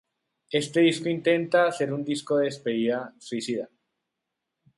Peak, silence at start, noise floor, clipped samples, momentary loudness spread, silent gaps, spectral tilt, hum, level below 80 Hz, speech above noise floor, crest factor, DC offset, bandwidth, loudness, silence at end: -10 dBFS; 0.5 s; -84 dBFS; under 0.1%; 11 LU; none; -5 dB/octave; none; -74 dBFS; 59 dB; 18 dB; under 0.1%; 11.5 kHz; -26 LUFS; 1.1 s